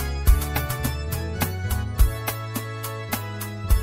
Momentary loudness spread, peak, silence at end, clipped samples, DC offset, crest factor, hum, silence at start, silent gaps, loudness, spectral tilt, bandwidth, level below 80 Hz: 9 LU; -4 dBFS; 0 s; under 0.1%; under 0.1%; 18 dB; none; 0 s; none; -26 LUFS; -5 dB/octave; 16.5 kHz; -26 dBFS